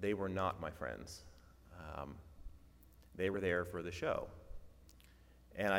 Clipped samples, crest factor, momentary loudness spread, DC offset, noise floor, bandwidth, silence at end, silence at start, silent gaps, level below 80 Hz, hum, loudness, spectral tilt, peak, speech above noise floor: under 0.1%; 24 dB; 23 LU; under 0.1%; -63 dBFS; 16.5 kHz; 0 s; 0 s; none; -60 dBFS; none; -41 LUFS; -5.5 dB/octave; -18 dBFS; 23 dB